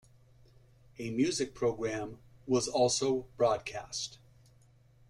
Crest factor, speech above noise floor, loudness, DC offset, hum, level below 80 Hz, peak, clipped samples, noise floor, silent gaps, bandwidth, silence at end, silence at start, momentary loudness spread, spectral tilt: 18 dB; 31 dB; -32 LUFS; under 0.1%; none; -62 dBFS; -16 dBFS; under 0.1%; -62 dBFS; none; 13 kHz; 0.95 s; 1 s; 13 LU; -4 dB/octave